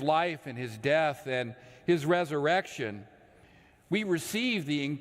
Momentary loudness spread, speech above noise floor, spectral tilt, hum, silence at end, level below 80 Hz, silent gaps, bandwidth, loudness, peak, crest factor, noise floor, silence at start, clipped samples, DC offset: 11 LU; 29 dB; -5 dB/octave; none; 0 s; -70 dBFS; none; 16 kHz; -30 LUFS; -12 dBFS; 18 dB; -59 dBFS; 0 s; under 0.1%; under 0.1%